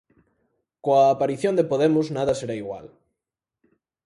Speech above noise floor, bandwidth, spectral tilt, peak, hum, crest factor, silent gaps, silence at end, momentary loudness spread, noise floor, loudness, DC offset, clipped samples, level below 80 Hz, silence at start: 65 dB; 11.5 kHz; -6.5 dB/octave; -6 dBFS; none; 18 dB; none; 1.2 s; 14 LU; -87 dBFS; -22 LUFS; under 0.1%; under 0.1%; -62 dBFS; 0.85 s